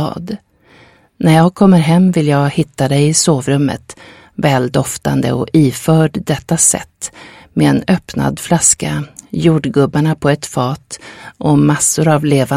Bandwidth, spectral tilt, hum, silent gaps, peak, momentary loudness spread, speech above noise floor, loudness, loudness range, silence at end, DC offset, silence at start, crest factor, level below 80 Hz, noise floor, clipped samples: 15.5 kHz; -5 dB/octave; none; none; 0 dBFS; 15 LU; 33 dB; -13 LUFS; 3 LU; 0 s; under 0.1%; 0 s; 14 dB; -44 dBFS; -46 dBFS; under 0.1%